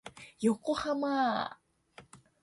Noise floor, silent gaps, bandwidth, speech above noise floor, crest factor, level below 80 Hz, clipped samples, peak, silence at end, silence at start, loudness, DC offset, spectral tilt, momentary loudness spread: -59 dBFS; none; 11.5 kHz; 28 dB; 18 dB; -68 dBFS; under 0.1%; -16 dBFS; 0.25 s; 0.05 s; -32 LUFS; under 0.1%; -5 dB/octave; 9 LU